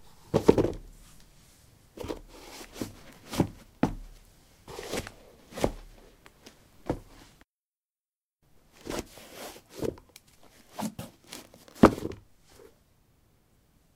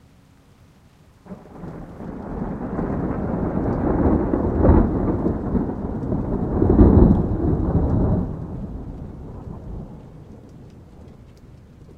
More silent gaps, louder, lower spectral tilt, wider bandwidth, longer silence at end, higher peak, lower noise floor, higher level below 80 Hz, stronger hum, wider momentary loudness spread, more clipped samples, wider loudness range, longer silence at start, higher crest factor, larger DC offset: first, 7.44-7.48 s, 7.63-7.73 s, 7.85-7.89 s, 8.00-8.04 s, 8.16-8.30 s vs none; second, -30 LUFS vs -20 LUFS; second, -6 dB/octave vs -11.5 dB/octave; first, 17 kHz vs 4.3 kHz; first, 1.75 s vs 0.05 s; about the same, -2 dBFS vs 0 dBFS; first, under -90 dBFS vs -52 dBFS; second, -50 dBFS vs -28 dBFS; neither; first, 24 LU vs 21 LU; neither; about the same, 12 LU vs 13 LU; second, 0.05 s vs 1.25 s; first, 32 dB vs 22 dB; neither